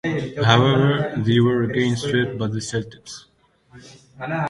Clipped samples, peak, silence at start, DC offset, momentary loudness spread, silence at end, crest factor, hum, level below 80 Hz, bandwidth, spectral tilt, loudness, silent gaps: under 0.1%; 0 dBFS; 0.05 s; under 0.1%; 19 LU; 0 s; 20 dB; none; -52 dBFS; 11.5 kHz; -6 dB/octave; -20 LUFS; none